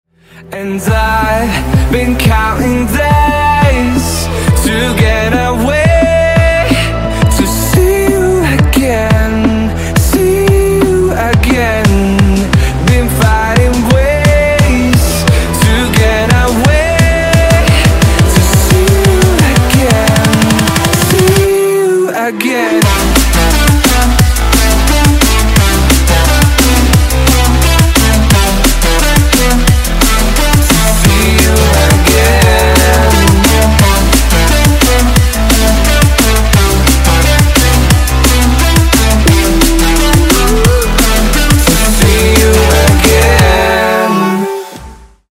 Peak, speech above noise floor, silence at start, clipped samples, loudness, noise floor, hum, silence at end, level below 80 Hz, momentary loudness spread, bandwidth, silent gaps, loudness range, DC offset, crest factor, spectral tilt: 0 dBFS; 21 dB; 0.35 s; 0.2%; -9 LUFS; -32 dBFS; none; 0.35 s; -12 dBFS; 4 LU; 16.5 kHz; none; 2 LU; under 0.1%; 8 dB; -4.5 dB/octave